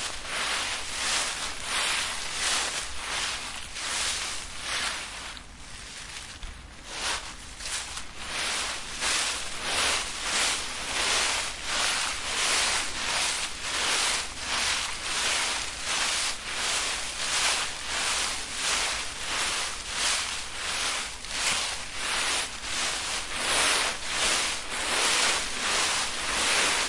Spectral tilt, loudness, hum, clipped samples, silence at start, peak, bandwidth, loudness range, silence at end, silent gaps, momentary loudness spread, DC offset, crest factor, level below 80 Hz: 0.5 dB/octave; -27 LUFS; none; under 0.1%; 0 s; -12 dBFS; 11.5 kHz; 7 LU; 0 s; none; 9 LU; under 0.1%; 18 dB; -48 dBFS